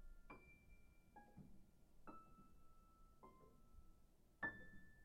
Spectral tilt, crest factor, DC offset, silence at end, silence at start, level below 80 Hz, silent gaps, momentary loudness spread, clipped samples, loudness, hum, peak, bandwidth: -6 dB/octave; 24 dB; under 0.1%; 0 s; 0 s; -68 dBFS; none; 18 LU; under 0.1%; -58 LUFS; none; -36 dBFS; 14 kHz